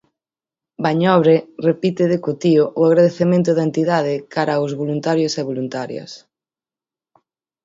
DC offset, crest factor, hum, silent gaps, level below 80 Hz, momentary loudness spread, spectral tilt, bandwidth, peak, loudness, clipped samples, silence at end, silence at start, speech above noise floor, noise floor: under 0.1%; 18 dB; none; none; -64 dBFS; 10 LU; -7 dB/octave; 7.8 kHz; 0 dBFS; -17 LUFS; under 0.1%; 1.45 s; 0.8 s; over 73 dB; under -90 dBFS